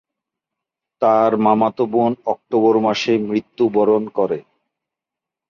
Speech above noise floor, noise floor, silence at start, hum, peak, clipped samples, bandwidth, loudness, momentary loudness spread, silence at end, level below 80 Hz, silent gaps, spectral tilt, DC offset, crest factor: 69 dB; -86 dBFS; 1 s; none; -2 dBFS; under 0.1%; 7.2 kHz; -17 LUFS; 7 LU; 1.1 s; -64 dBFS; none; -6.5 dB/octave; under 0.1%; 16 dB